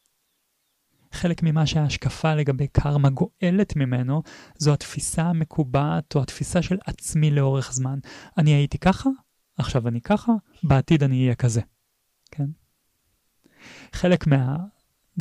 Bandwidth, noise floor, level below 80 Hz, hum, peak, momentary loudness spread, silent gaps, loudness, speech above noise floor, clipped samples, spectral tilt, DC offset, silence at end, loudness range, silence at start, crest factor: 12.5 kHz; -72 dBFS; -42 dBFS; none; -8 dBFS; 11 LU; none; -23 LUFS; 50 dB; under 0.1%; -6.5 dB/octave; under 0.1%; 0 s; 4 LU; 1.15 s; 14 dB